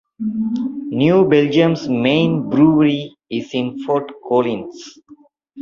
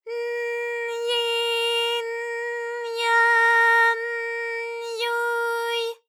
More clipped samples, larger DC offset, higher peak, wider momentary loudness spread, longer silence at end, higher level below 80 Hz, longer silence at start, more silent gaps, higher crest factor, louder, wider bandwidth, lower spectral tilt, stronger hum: neither; neither; first, 0 dBFS vs -8 dBFS; about the same, 12 LU vs 12 LU; second, 0 s vs 0.15 s; first, -56 dBFS vs under -90 dBFS; first, 0.2 s vs 0.05 s; neither; about the same, 16 dB vs 14 dB; first, -17 LUFS vs -22 LUFS; second, 7.2 kHz vs 16 kHz; first, -7.5 dB/octave vs 4.5 dB/octave; neither